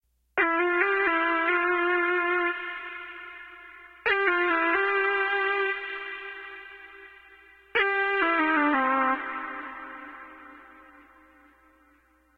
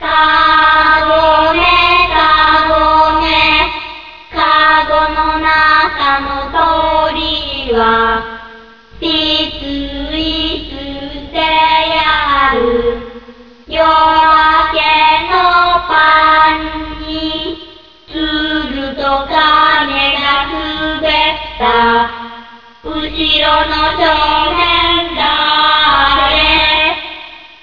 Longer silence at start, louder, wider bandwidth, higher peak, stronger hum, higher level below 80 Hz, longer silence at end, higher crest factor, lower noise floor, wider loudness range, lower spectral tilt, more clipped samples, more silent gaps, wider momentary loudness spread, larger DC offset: first, 0.35 s vs 0 s; second, -25 LUFS vs -10 LUFS; about the same, 5.2 kHz vs 5.4 kHz; second, -10 dBFS vs 0 dBFS; neither; second, -66 dBFS vs -32 dBFS; first, 1.7 s vs 0.15 s; first, 18 dB vs 12 dB; first, -63 dBFS vs -37 dBFS; about the same, 3 LU vs 5 LU; about the same, -4.5 dB/octave vs -5 dB/octave; neither; neither; first, 20 LU vs 13 LU; second, under 0.1% vs 0.7%